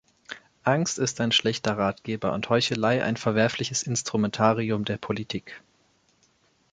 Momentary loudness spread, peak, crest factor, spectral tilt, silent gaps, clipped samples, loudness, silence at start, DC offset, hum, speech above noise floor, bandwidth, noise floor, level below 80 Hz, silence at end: 12 LU; -6 dBFS; 22 dB; -4 dB/octave; none; under 0.1%; -25 LUFS; 0.3 s; under 0.1%; none; 40 dB; 9.4 kHz; -65 dBFS; -60 dBFS; 1.15 s